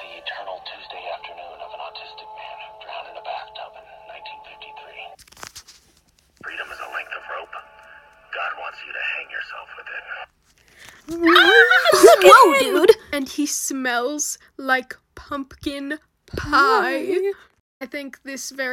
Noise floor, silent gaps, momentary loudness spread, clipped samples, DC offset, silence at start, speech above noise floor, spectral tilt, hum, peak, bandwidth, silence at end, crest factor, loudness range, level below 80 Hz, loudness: -59 dBFS; 17.60-17.80 s; 27 LU; under 0.1%; under 0.1%; 0 s; 36 dB; -2 dB/octave; none; 0 dBFS; 17 kHz; 0 s; 20 dB; 23 LU; -54 dBFS; -16 LUFS